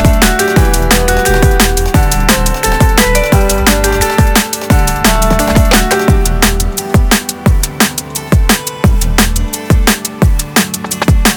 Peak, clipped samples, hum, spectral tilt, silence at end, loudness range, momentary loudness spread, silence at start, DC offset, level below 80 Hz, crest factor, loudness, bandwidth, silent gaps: 0 dBFS; under 0.1%; none; -4 dB/octave; 0 s; 2 LU; 4 LU; 0 s; under 0.1%; -14 dBFS; 10 dB; -11 LUFS; over 20 kHz; none